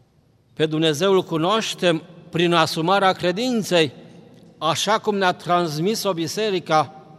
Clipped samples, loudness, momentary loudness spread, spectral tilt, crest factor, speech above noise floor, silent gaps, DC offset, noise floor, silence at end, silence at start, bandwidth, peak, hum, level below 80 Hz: under 0.1%; -20 LUFS; 6 LU; -4.5 dB/octave; 20 dB; 38 dB; none; under 0.1%; -58 dBFS; 0.15 s; 0.6 s; 15 kHz; -2 dBFS; none; -66 dBFS